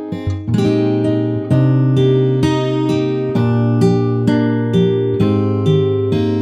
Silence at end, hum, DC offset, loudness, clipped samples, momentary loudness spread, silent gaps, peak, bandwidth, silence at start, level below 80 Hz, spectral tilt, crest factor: 0 s; none; under 0.1%; -15 LUFS; under 0.1%; 4 LU; none; -2 dBFS; 9.4 kHz; 0 s; -46 dBFS; -8.5 dB/octave; 12 dB